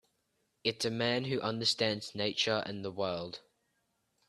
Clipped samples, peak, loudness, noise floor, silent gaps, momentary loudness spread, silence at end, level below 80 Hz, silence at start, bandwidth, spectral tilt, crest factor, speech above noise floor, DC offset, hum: under 0.1%; -14 dBFS; -33 LUFS; -79 dBFS; none; 10 LU; 0.9 s; -72 dBFS; 0.65 s; 13.5 kHz; -4 dB/octave; 22 dB; 45 dB; under 0.1%; none